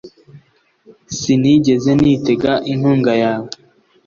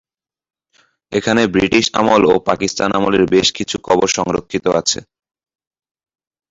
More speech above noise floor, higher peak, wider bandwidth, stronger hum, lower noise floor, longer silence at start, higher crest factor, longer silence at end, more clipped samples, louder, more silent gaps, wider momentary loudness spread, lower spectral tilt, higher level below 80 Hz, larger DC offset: second, 40 dB vs 44 dB; about the same, -2 dBFS vs 0 dBFS; about the same, 7.4 kHz vs 8 kHz; neither; second, -53 dBFS vs -58 dBFS; second, 0.05 s vs 1.1 s; about the same, 14 dB vs 16 dB; second, 0.55 s vs 1.5 s; neither; about the same, -15 LUFS vs -15 LUFS; neither; first, 13 LU vs 7 LU; first, -6 dB/octave vs -3.5 dB/octave; about the same, -48 dBFS vs -46 dBFS; neither